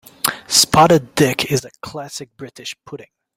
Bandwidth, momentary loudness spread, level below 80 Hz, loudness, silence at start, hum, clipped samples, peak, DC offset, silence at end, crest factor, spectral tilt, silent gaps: 16.5 kHz; 22 LU; -50 dBFS; -15 LUFS; 0.25 s; none; under 0.1%; 0 dBFS; under 0.1%; 0.4 s; 18 dB; -3.5 dB/octave; none